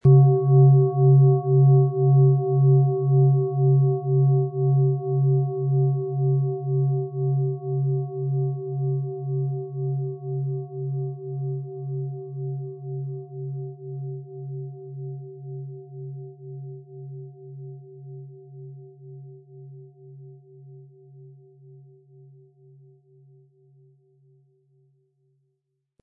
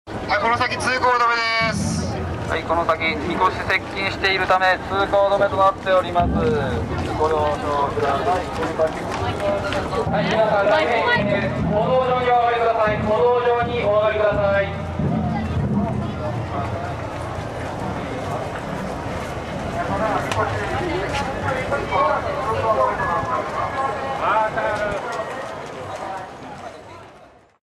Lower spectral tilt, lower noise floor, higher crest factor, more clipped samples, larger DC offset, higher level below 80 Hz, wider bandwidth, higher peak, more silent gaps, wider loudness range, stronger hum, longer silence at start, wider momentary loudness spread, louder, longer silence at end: first, -16.5 dB/octave vs -5.5 dB/octave; first, -77 dBFS vs -48 dBFS; about the same, 18 dB vs 14 dB; neither; neither; second, -66 dBFS vs -40 dBFS; second, 1.2 kHz vs 13.5 kHz; about the same, -6 dBFS vs -6 dBFS; neither; first, 23 LU vs 7 LU; neither; about the same, 0.05 s vs 0.05 s; first, 23 LU vs 10 LU; about the same, -22 LUFS vs -21 LUFS; first, 4.75 s vs 0.4 s